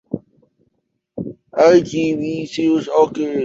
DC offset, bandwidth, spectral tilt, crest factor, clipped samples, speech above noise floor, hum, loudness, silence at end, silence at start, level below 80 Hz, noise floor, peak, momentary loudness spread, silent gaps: under 0.1%; 7.8 kHz; -6 dB/octave; 16 dB; under 0.1%; 53 dB; none; -16 LUFS; 0 s; 0.1 s; -56 dBFS; -69 dBFS; -2 dBFS; 18 LU; none